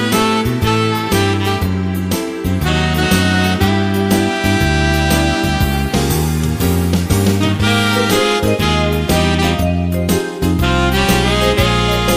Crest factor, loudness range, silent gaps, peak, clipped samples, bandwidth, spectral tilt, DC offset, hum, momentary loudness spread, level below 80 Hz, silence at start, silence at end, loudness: 12 dB; 1 LU; none; -2 dBFS; under 0.1%; 16 kHz; -5 dB/octave; under 0.1%; none; 4 LU; -24 dBFS; 0 s; 0 s; -14 LUFS